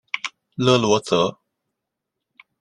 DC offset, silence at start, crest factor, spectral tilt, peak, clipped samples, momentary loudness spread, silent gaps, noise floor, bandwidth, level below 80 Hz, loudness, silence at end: under 0.1%; 0.15 s; 22 dB; -4.5 dB/octave; -2 dBFS; under 0.1%; 11 LU; none; -82 dBFS; 11.5 kHz; -60 dBFS; -20 LUFS; 1.3 s